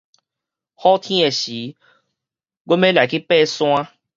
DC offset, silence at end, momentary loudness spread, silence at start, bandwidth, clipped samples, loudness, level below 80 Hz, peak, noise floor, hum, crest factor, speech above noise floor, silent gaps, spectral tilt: under 0.1%; 0.3 s; 9 LU; 0.8 s; 7.6 kHz; under 0.1%; -17 LUFS; -68 dBFS; -2 dBFS; -85 dBFS; none; 18 dB; 68 dB; 2.60-2.65 s; -4.5 dB/octave